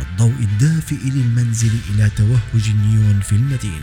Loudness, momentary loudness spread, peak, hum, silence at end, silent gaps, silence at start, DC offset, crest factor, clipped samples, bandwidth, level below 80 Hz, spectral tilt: -17 LUFS; 3 LU; -2 dBFS; none; 0 s; none; 0 s; under 0.1%; 12 dB; under 0.1%; 13.5 kHz; -34 dBFS; -6 dB/octave